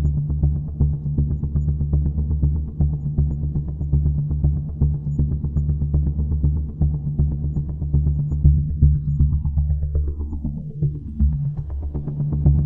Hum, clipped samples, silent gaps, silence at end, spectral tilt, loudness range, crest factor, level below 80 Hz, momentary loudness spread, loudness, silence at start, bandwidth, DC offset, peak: none; under 0.1%; none; 0 s; -14 dB/octave; 2 LU; 18 dB; -24 dBFS; 7 LU; -22 LUFS; 0 s; 1.3 kHz; under 0.1%; -2 dBFS